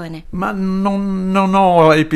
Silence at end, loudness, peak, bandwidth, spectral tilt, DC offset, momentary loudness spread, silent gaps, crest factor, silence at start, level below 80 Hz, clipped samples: 0 s; -15 LUFS; 0 dBFS; 12.5 kHz; -7 dB/octave; under 0.1%; 12 LU; none; 14 dB; 0 s; -40 dBFS; under 0.1%